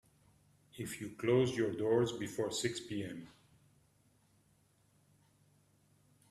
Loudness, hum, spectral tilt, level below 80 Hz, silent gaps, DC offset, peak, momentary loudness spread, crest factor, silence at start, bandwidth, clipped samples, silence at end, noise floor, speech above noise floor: -36 LUFS; none; -5 dB/octave; -72 dBFS; none; under 0.1%; -18 dBFS; 14 LU; 20 dB; 0.75 s; 14 kHz; under 0.1%; 3 s; -72 dBFS; 36 dB